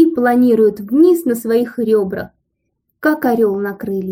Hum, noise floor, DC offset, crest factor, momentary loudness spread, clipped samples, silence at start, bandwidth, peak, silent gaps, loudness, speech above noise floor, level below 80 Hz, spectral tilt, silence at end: none; -71 dBFS; under 0.1%; 14 dB; 10 LU; under 0.1%; 0 s; 16.5 kHz; -2 dBFS; none; -15 LUFS; 57 dB; -56 dBFS; -7 dB/octave; 0 s